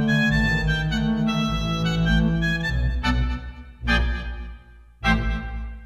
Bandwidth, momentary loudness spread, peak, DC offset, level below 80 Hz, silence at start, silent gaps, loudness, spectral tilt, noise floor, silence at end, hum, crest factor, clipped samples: 12.5 kHz; 13 LU; -6 dBFS; under 0.1%; -28 dBFS; 0 s; none; -23 LUFS; -6 dB/octave; -45 dBFS; 0 s; none; 16 dB; under 0.1%